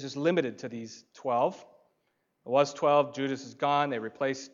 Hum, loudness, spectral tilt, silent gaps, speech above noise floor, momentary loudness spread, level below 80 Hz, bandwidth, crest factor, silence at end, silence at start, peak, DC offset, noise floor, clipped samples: none; -29 LUFS; -5 dB/octave; none; 47 dB; 15 LU; -84 dBFS; 7.6 kHz; 20 dB; 0.05 s; 0 s; -10 dBFS; under 0.1%; -76 dBFS; under 0.1%